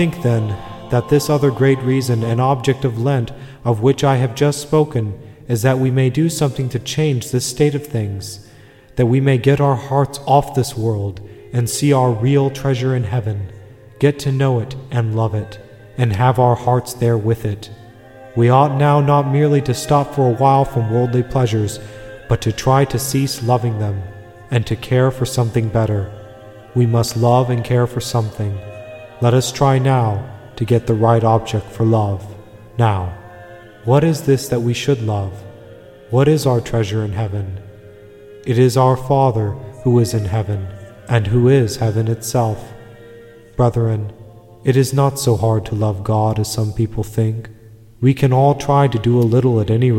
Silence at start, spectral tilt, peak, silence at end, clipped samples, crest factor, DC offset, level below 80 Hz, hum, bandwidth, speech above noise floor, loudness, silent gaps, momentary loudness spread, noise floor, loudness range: 0 s; -6.5 dB/octave; 0 dBFS; 0 s; under 0.1%; 16 dB; 0.1%; -42 dBFS; none; 16.5 kHz; 28 dB; -17 LUFS; none; 12 LU; -43 dBFS; 3 LU